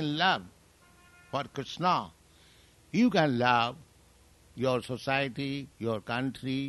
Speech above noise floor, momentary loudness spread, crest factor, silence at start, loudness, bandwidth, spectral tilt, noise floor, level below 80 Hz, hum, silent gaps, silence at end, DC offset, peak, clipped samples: 31 dB; 12 LU; 22 dB; 0 s; -30 LUFS; 12 kHz; -5.5 dB/octave; -60 dBFS; -64 dBFS; none; none; 0 s; under 0.1%; -8 dBFS; under 0.1%